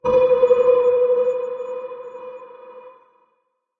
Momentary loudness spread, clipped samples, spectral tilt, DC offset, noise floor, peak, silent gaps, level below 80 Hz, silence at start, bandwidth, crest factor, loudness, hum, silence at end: 21 LU; under 0.1%; -6.5 dB/octave; under 0.1%; -70 dBFS; -4 dBFS; none; -58 dBFS; 0.05 s; 3.7 kHz; 16 dB; -17 LUFS; none; 0.9 s